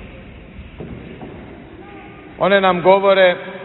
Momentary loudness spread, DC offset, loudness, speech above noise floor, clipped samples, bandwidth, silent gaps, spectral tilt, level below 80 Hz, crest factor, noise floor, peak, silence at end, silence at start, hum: 25 LU; under 0.1%; -14 LUFS; 24 dB; under 0.1%; 4.2 kHz; none; -9.5 dB/octave; -44 dBFS; 18 dB; -37 dBFS; -2 dBFS; 0 s; 0 s; none